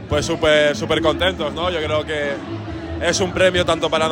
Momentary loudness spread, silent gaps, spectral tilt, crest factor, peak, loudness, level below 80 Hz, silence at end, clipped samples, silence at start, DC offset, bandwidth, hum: 10 LU; none; -4 dB/octave; 18 dB; -2 dBFS; -19 LUFS; -40 dBFS; 0 s; under 0.1%; 0 s; under 0.1%; 16.5 kHz; none